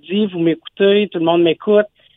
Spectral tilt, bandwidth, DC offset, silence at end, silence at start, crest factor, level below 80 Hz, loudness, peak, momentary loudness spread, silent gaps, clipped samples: -9.5 dB/octave; 4 kHz; under 0.1%; 0.3 s; 0.1 s; 14 dB; -64 dBFS; -16 LUFS; -2 dBFS; 5 LU; none; under 0.1%